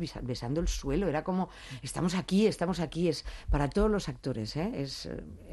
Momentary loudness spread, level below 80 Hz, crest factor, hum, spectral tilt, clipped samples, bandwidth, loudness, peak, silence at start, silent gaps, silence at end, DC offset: 10 LU; -40 dBFS; 18 dB; none; -6 dB/octave; under 0.1%; 12.5 kHz; -32 LUFS; -14 dBFS; 0 s; none; 0 s; under 0.1%